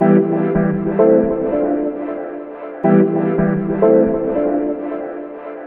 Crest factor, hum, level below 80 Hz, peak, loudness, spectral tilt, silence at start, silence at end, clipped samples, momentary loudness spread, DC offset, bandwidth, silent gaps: 16 dB; none; -44 dBFS; 0 dBFS; -16 LUFS; -10 dB/octave; 0 s; 0 s; under 0.1%; 15 LU; under 0.1%; 3.4 kHz; none